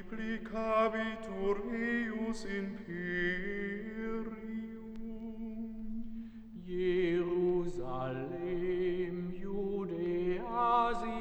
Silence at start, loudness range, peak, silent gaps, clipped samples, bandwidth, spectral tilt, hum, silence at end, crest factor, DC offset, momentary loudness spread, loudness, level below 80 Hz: 0 s; 5 LU; -18 dBFS; none; under 0.1%; 9 kHz; -7 dB/octave; none; 0 s; 18 dB; under 0.1%; 12 LU; -36 LUFS; -50 dBFS